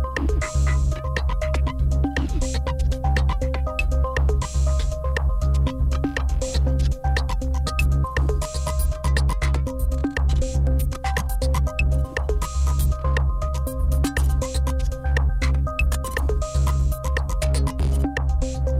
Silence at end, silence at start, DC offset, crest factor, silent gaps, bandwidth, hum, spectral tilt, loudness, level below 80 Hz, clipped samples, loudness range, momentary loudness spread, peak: 0 s; 0 s; under 0.1%; 8 dB; none; 15.5 kHz; none; -6 dB/octave; -23 LUFS; -22 dBFS; under 0.1%; 1 LU; 3 LU; -12 dBFS